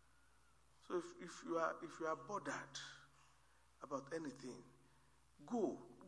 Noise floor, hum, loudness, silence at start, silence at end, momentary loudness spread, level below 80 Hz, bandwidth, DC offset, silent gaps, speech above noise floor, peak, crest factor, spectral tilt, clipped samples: -74 dBFS; none; -47 LUFS; 0.85 s; 0 s; 14 LU; -80 dBFS; 11 kHz; under 0.1%; none; 28 dB; -26 dBFS; 22 dB; -4.5 dB/octave; under 0.1%